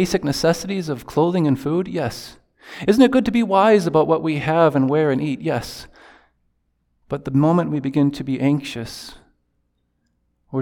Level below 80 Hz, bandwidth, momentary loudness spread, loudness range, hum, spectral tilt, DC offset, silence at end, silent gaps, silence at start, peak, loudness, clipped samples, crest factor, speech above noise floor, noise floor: -50 dBFS; 18 kHz; 16 LU; 5 LU; none; -6.5 dB/octave; under 0.1%; 0 s; none; 0 s; -2 dBFS; -19 LUFS; under 0.1%; 18 dB; 50 dB; -69 dBFS